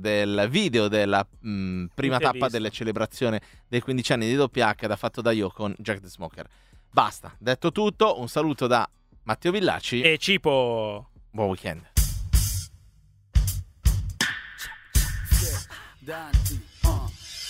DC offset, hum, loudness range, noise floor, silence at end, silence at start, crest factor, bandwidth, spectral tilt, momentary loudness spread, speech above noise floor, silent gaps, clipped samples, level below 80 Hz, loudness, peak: under 0.1%; none; 4 LU; -56 dBFS; 0 s; 0 s; 22 dB; 16 kHz; -4.5 dB/octave; 11 LU; 31 dB; none; under 0.1%; -32 dBFS; -25 LUFS; -2 dBFS